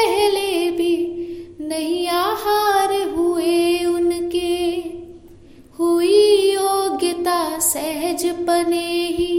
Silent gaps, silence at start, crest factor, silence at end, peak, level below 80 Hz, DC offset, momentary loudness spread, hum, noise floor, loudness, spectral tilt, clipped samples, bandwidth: none; 0 s; 16 dB; 0 s; -4 dBFS; -50 dBFS; under 0.1%; 9 LU; none; -44 dBFS; -19 LUFS; -2.5 dB/octave; under 0.1%; 16.5 kHz